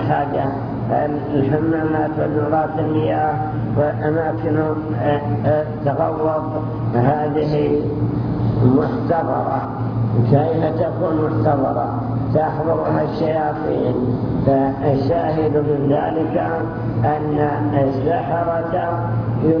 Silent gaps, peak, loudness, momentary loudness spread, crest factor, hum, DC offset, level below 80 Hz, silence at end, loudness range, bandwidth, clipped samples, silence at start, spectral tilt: none; -2 dBFS; -19 LUFS; 4 LU; 16 dB; none; under 0.1%; -40 dBFS; 0 s; 1 LU; 5.4 kHz; under 0.1%; 0 s; -11 dB/octave